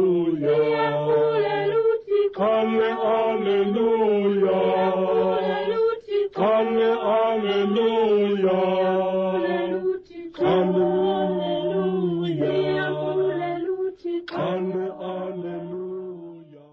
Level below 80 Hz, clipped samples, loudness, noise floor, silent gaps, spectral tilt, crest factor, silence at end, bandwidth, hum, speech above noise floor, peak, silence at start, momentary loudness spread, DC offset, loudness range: -62 dBFS; under 0.1%; -22 LUFS; -42 dBFS; none; -8.5 dB/octave; 10 dB; 0.15 s; 6 kHz; none; 22 dB; -12 dBFS; 0 s; 10 LU; under 0.1%; 5 LU